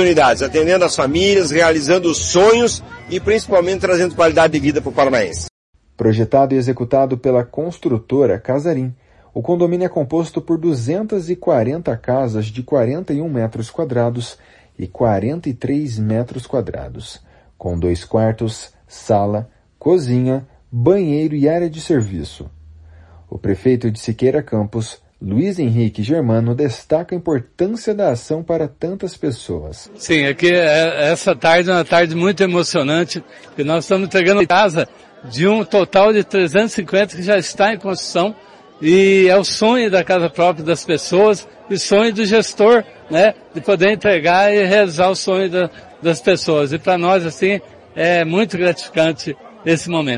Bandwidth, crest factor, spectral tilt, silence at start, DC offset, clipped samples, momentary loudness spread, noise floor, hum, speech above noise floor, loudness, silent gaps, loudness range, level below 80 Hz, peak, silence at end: 11 kHz; 14 dB; -5.5 dB/octave; 0 s; under 0.1%; under 0.1%; 12 LU; -42 dBFS; none; 27 dB; -16 LUFS; 5.50-5.73 s; 6 LU; -48 dBFS; 0 dBFS; 0 s